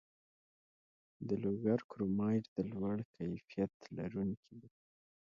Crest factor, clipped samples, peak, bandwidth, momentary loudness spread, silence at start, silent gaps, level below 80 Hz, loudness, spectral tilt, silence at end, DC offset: 18 dB; under 0.1%; -22 dBFS; 7 kHz; 12 LU; 1.2 s; 1.84-1.89 s, 2.48-2.56 s, 3.05-3.14 s, 3.74-3.80 s, 4.37-4.43 s; -68 dBFS; -39 LUFS; -9 dB/octave; 0.55 s; under 0.1%